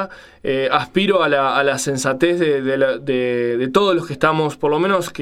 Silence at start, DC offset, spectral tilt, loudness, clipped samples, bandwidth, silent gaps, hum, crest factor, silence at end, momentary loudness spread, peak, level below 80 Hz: 0 s; under 0.1%; -4.5 dB/octave; -18 LUFS; under 0.1%; 15.5 kHz; none; none; 18 dB; 0 s; 4 LU; 0 dBFS; -54 dBFS